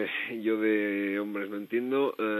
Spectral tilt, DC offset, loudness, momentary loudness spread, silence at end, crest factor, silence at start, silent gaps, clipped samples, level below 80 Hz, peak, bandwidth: -7 dB/octave; under 0.1%; -29 LUFS; 6 LU; 0 s; 14 dB; 0 s; none; under 0.1%; -90 dBFS; -16 dBFS; 13.5 kHz